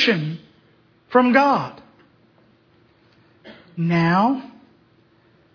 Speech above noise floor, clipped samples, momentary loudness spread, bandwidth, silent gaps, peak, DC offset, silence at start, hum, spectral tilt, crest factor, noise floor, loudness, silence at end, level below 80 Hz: 39 dB; under 0.1%; 17 LU; 5.4 kHz; none; -2 dBFS; under 0.1%; 0 s; none; -7 dB/octave; 20 dB; -57 dBFS; -19 LUFS; 1.05 s; -64 dBFS